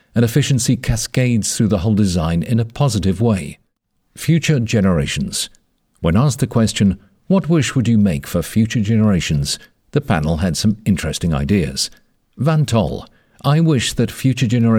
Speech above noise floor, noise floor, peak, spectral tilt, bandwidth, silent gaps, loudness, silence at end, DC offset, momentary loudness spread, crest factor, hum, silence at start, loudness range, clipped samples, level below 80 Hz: 50 dB; -66 dBFS; -2 dBFS; -5.5 dB/octave; 17 kHz; none; -17 LUFS; 0 s; under 0.1%; 7 LU; 14 dB; none; 0.15 s; 2 LU; under 0.1%; -36 dBFS